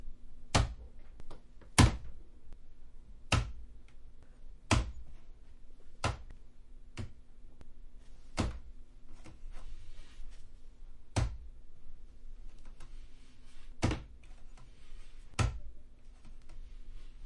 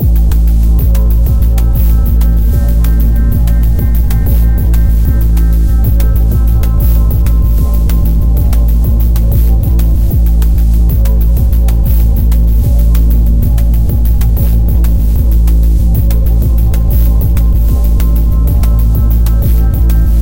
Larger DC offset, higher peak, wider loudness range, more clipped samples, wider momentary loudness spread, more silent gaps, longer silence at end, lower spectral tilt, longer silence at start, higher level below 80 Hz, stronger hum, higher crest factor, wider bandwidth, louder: neither; second, -10 dBFS vs 0 dBFS; first, 11 LU vs 0 LU; neither; first, 27 LU vs 1 LU; neither; about the same, 0 s vs 0 s; second, -4.5 dB/octave vs -8 dB/octave; about the same, 0 s vs 0 s; second, -44 dBFS vs -8 dBFS; neither; first, 28 dB vs 6 dB; second, 11.5 kHz vs 17 kHz; second, -35 LUFS vs -11 LUFS